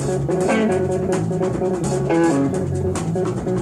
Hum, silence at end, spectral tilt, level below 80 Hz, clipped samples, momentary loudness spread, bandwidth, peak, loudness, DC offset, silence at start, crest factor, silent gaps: none; 0 s; -7 dB/octave; -42 dBFS; under 0.1%; 5 LU; 13 kHz; -6 dBFS; -20 LUFS; under 0.1%; 0 s; 12 dB; none